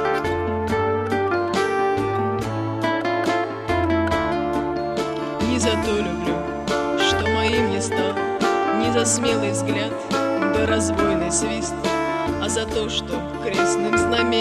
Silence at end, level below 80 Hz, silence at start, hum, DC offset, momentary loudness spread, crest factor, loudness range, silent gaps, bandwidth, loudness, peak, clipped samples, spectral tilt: 0 s; -42 dBFS; 0 s; none; under 0.1%; 5 LU; 16 dB; 2 LU; none; 14.5 kHz; -21 LUFS; -6 dBFS; under 0.1%; -4 dB/octave